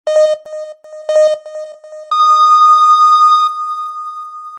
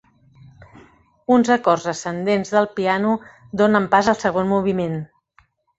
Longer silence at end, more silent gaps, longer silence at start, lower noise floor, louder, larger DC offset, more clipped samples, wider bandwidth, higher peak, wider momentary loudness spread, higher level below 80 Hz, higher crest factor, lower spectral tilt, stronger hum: second, 0 s vs 0.75 s; neither; second, 0.05 s vs 0.6 s; second, -30 dBFS vs -59 dBFS; first, -10 LUFS vs -19 LUFS; neither; neither; first, 10.5 kHz vs 8 kHz; about the same, -2 dBFS vs -2 dBFS; first, 21 LU vs 10 LU; second, -82 dBFS vs -56 dBFS; second, 10 dB vs 18 dB; second, 2 dB/octave vs -6 dB/octave; neither